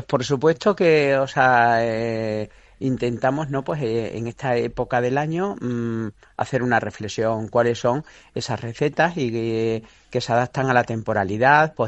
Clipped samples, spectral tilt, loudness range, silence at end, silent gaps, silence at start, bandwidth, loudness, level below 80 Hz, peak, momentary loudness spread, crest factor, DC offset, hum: under 0.1%; -6 dB/octave; 4 LU; 0 s; none; 0 s; 8.4 kHz; -22 LUFS; -52 dBFS; -2 dBFS; 12 LU; 20 dB; under 0.1%; none